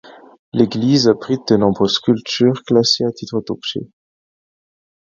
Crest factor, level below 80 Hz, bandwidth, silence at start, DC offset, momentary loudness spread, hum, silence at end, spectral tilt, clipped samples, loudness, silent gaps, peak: 18 dB; -54 dBFS; 7.6 kHz; 0.55 s; under 0.1%; 10 LU; none; 1.2 s; -5.5 dB/octave; under 0.1%; -16 LUFS; none; 0 dBFS